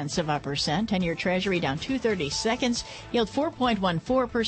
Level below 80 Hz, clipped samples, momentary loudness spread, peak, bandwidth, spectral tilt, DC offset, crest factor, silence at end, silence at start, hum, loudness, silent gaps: -48 dBFS; under 0.1%; 3 LU; -12 dBFS; 8.8 kHz; -4.5 dB/octave; under 0.1%; 14 dB; 0 s; 0 s; none; -26 LUFS; none